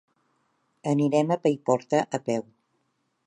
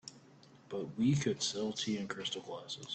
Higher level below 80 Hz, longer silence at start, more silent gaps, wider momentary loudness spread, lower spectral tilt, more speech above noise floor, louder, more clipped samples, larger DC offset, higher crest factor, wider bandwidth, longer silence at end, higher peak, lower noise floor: about the same, -74 dBFS vs -72 dBFS; first, 0.85 s vs 0.05 s; neither; second, 8 LU vs 12 LU; first, -6.5 dB/octave vs -4.5 dB/octave; first, 50 dB vs 24 dB; first, -26 LUFS vs -36 LUFS; neither; neither; about the same, 20 dB vs 18 dB; first, 10 kHz vs 9 kHz; first, 0.85 s vs 0 s; first, -8 dBFS vs -20 dBFS; first, -74 dBFS vs -60 dBFS